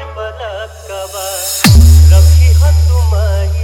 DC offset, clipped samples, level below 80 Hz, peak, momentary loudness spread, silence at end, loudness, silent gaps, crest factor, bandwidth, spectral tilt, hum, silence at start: under 0.1%; 0.8%; -10 dBFS; 0 dBFS; 18 LU; 0 s; -9 LUFS; none; 8 dB; 17 kHz; -5 dB/octave; none; 0 s